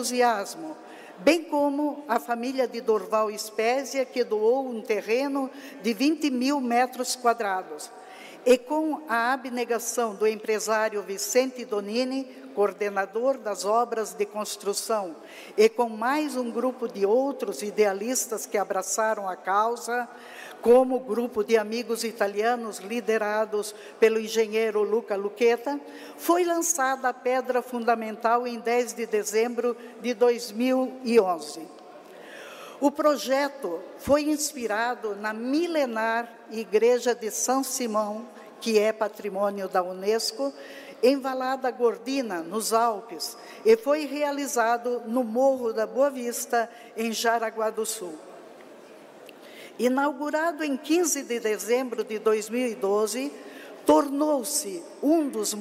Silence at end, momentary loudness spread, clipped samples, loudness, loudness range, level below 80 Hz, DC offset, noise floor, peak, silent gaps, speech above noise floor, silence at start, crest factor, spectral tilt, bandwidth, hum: 0 s; 11 LU; under 0.1%; -26 LUFS; 2 LU; -70 dBFS; under 0.1%; -48 dBFS; -8 dBFS; none; 22 dB; 0 s; 16 dB; -3 dB/octave; 16 kHz; none